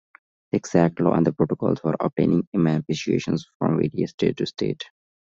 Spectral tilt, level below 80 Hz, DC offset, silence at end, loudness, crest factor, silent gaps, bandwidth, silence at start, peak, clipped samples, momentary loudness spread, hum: -7 dB/octave; -56 dBFS; under 0.1%; 0.45 s; -23 LUFS; 20 dB; 2.47-2.52 s, 3.55-3.60 s, 4.14-4.18 s; 7.6 kHz; 0.55 s; -4 dBFS; under 0.1%; 8 LU; none